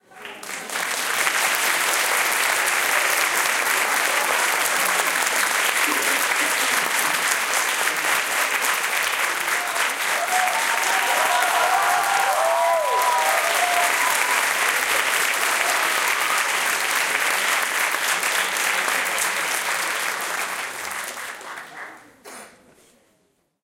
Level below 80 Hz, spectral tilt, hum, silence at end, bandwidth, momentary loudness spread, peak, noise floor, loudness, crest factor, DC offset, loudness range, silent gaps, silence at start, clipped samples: -72 dBFS; 1 dB/octave; none; 1.15 s; 17 kHz; 7 LU; -2 dBFS; -66 dBFS; -20 LUFS; 20 dB; under 0.1%; 4 LU; none; 0.15 s; under 0.1%